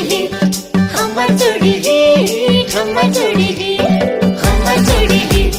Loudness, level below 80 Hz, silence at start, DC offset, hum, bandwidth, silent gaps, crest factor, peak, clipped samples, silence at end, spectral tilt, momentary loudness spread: -13 LUFS; -22 dBFS; 0 s; under 0.1%; none; 16.5 kHz; none; 12 dB; 0 dBFS; under 0.1%; 0 s; -5 dB/octave; 4 LU